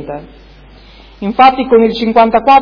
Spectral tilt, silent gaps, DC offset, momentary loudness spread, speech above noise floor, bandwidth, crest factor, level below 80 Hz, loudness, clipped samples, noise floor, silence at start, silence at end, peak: -7 dB/octave; none; under 0.1%; 17 LU; 28 dB; 5.4 kHz; 12 dB; -40 dBFS; -9 LUFS; 0.7%; -38 dBFS; 0 s; 0 s; 0 dBFS